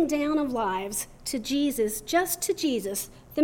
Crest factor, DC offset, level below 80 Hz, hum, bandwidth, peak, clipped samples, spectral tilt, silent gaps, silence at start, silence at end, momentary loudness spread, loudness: 16 dB; under 0.1%; -52 dBFS; none; over 20 kHz; -12 dBFS; under 0.1%; -3 dB/octave; none; 0 s; 0 s; 7 LU; -28 LUFS